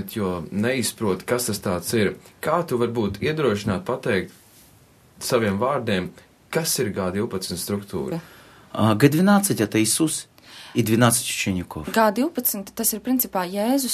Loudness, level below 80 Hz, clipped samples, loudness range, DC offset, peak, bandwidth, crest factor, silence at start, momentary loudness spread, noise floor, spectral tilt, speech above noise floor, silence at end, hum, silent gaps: -22 LUFS; -54 dBFS; under 0.1%; 5 LU; under 0.1%; 0 dBFS; 14 kHz; 22 dB; 0 s; 11 LU; -53 dBFS; -4.5 dB/octave; 31 dB; 0 s; none; none